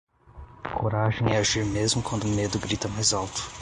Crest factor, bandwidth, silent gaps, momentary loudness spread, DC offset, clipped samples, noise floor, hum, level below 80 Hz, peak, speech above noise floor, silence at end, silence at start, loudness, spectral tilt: 18 dB; 11.5 kHz; none; 7 LU; under 0.1%; under 0.1%; -47 dBFS; none; -44 dBFS; -8 dBFS; 21 dB; 0 s; 0.35 s; -25 LUFS; -4 dB/octave